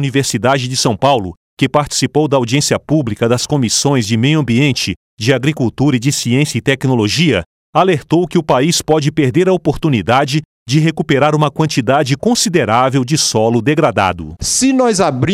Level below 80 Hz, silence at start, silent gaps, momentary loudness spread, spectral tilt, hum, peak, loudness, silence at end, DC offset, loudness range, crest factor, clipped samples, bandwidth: -42 dBFS; 0 s; 1.37-1.57 s, 4.96-5.17 s, 7.46-7.73 s, 10.45-10.66 s; 4 LU; -4.5 dB/octave; none; 0 dBFS; -13 LUFS; 0 s; under 0.1%; 1 LU; 12 dB; under 0.1%; 16 kHz